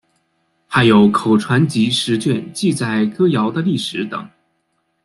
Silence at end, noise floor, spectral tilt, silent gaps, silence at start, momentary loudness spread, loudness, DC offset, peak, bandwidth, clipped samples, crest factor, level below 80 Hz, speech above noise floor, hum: 0.8 s; -67 dBFS; -5.5 dB/octave; none; 0.7 s; 9 LU; -16 LUFS; under 0.1%; -2 dBFS; 12 kHz; under 0.1%; 16 dB; -54 dBFS; 52 dB; none